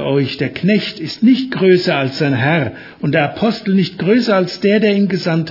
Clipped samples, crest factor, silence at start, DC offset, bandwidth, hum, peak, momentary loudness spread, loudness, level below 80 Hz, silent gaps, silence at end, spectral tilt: under 0.1%; 14 dB; 0 s; under 0.1%; 5.8 kHz; none; 0 dBFS; 5 LU; -15 LUFS; -56 dBFS; none; 0 s; -7 dB/octave